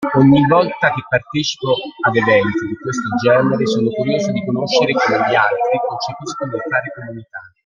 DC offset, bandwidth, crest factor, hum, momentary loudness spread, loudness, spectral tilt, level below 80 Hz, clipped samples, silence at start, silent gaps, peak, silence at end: under 0.1%; 7.4 kHz; 16 dB; none; 11 LU; -16 LUFS; -5.5 dB/octave; -54 dBFS; under 0.1%; 0 s; none; 0 dBFS; 0.2 s